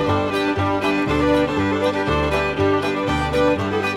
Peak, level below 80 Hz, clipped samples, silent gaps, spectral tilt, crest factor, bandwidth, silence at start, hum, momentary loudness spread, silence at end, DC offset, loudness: -6 dBFS; -36 dBFS; under 0.1%; none; -6 dB/octave; 14 dB; 14 kHz; 0 s; none; 2 LU; 0 s; under 0.1%; -19 LUFS